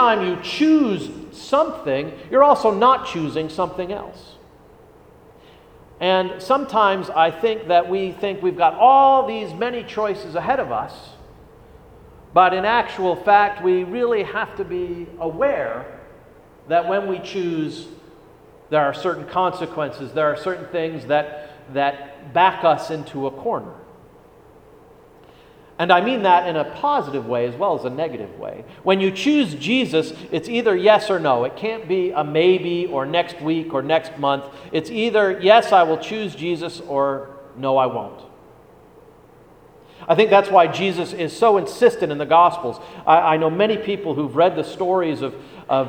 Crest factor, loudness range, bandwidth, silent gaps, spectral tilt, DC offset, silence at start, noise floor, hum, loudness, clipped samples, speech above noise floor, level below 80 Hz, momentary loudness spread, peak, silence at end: 20 dB; 7 LU; 16 kHz; none; -5.5 dB/octave; under 0.1%; 0 s; -48 dBFS; none; -19 LUFS; under 0.1%; 29 dB; -56 dBFS; 13 LU; 0 dBFS; 0 s